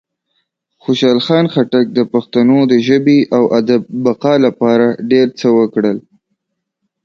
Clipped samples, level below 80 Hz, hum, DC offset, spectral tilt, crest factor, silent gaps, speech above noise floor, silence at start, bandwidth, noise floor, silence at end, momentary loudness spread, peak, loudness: under 0.1%; -58 dBFS; none; under 0.1%; -7 dB/octave; 12 dB; none; 62 dB; 0.9 s; 7.2 kHz; -73 dBFS; 1.05 s; 5 LU; 0 dBFS; -12 LUFS